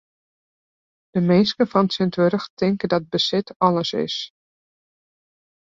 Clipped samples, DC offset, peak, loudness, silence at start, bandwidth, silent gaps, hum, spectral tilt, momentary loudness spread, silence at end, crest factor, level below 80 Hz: under 0.1%; under 0.1%; -2 dBFS; -21 LUFS; 1.15 s; 7.6 kHz; 2.50-2.57 s, 3.56-3.60 s; none; -6.5 dB/octave; 8 LU; 1.5 s; 20 dB; -62 dBFS